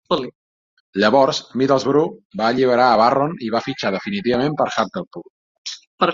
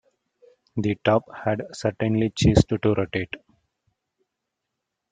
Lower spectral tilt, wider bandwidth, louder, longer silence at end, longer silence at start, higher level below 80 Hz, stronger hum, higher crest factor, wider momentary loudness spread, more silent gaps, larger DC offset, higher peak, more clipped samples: about the same, -5.5 dB/octave vs -6.5 dB/octave; second, 7.6 kHz vs 9.4 kHz; first, -18 LUFS vs -23 LUFS; second, 0 s vs 1.75 s; second, 0.1 s vs 0.75 s; second, -58 dBFS vs -44 dBFS; neither; second, 18 dB vs 24 dB; first, 17 LU vs 11 LU; first, 0.35-0.93 s, 2.25-2.30 s, 5.07-5.11 s, 5.30-5.65 s, 5.87-5.98 s vs none; neither; about the same, -2 dBFS vs -2 dBFS; neither